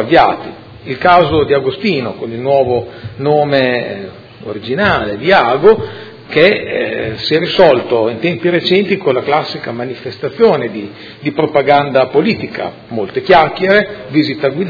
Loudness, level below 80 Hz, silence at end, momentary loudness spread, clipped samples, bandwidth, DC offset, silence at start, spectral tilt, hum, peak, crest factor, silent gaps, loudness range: -13 LUFS; -44 dBFS; 0 s; 14 LU; 0.4%; 5.4 kHz; under 0.1%; 0 s; -7.5 dB/octave; none; 0 dBFS; 12 dB; none; 3 LU